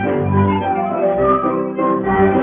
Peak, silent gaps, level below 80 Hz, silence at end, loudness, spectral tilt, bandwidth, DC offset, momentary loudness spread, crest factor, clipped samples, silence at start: -2 dBFS; none; -42 dBFS; 0 s; -16 LUFS; -7.5 dB/octave; 3.7 kHz; under 0.1%; 4 LU; 12 dB; under 0.1%; 0 s